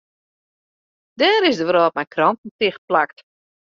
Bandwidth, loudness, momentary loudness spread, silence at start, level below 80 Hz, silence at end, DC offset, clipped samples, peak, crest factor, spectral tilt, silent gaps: 7.4 kHz; -18 LUFS; 7 LU; 1.2 s; -68 dBFS; 0.65 s; under 0.1%; under 0.1%; -4 dBFS; 18 dB; -1.5 dB/octave; 2.38-2.44 s, 2.51-2.59 s, 2.78-2.88 s